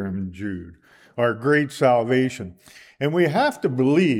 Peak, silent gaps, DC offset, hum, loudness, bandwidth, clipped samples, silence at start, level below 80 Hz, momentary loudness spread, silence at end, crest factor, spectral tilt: -6 dBFS; none; under 0.1%; none; -21 LUFS; 15.5 kHz; under 0.1%; 0 s; -60 dBFS; 16 LU; 0 s; 16 dB; -6.5 dB/octave